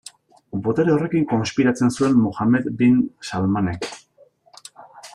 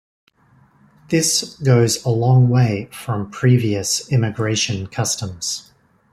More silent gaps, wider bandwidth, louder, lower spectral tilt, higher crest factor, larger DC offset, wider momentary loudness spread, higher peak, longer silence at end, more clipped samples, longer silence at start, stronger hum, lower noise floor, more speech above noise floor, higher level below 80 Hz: neither; second, 11.5 kHz vs 13.5 kHz; about the same, -20 LUFS vs -18 LUFS; first, -6.5 dB/octave vs -5 dB/octave; about the same, 14 dB vs 16 dB; neither; about the same, 9 LU vs 10 LU; second, -6 dBFS vs -2 dBFS; second, 0.05 s vs 0.5 s; neither; second, 0.55 s vs 1.1 s; neither; about the same, -55 dBFS vs -54 dBFS; about the same, 36 dB vs 37 dB; about the same, -56 dBFS vs -54 dBFS